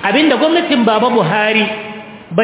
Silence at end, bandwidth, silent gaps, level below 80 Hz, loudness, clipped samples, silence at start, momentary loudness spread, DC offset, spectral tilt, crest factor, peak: 0 s; 4 kHz; none; -60 dBFS; -13 LUFS; under 0.1%; 0 s; 14 LU; under 0.1%; -9 dB/octave; 12 dB; 0 dBFS